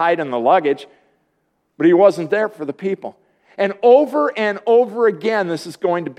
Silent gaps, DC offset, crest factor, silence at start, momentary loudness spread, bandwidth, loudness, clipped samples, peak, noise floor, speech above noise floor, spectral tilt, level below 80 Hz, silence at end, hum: none; under 0.1%; 16 dB; 0 s; 12 LU; 12 kHz; -17 LUFS; under 0.1%; 0 dBFS; -68 dBFS; 51 dB; -6.5 dB/octave; -74 dBFS; 0.05 s; none